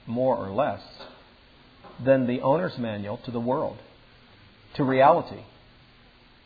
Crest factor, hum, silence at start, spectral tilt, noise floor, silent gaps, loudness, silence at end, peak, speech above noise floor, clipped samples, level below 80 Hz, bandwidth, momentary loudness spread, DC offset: 22 dB; none; 0.05 s; -9.5 dB/octave; -55 dBFS; none; -25 LUFS; 1 s; -6 dBFS; 30 dB; under 0.1%; -60 dBFS; 5 kHz; 24 LU; under 0.1%